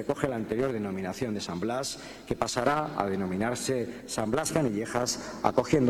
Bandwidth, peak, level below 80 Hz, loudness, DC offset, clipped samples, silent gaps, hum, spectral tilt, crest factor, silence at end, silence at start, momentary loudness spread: 18 kHz; -6 dBFS; -54 dBFS; -30 LUFS; under 0.1%; under 0.1%; none; none; -4.5 dB/octave; 24 dB; 0 s; 0 s; 6 LU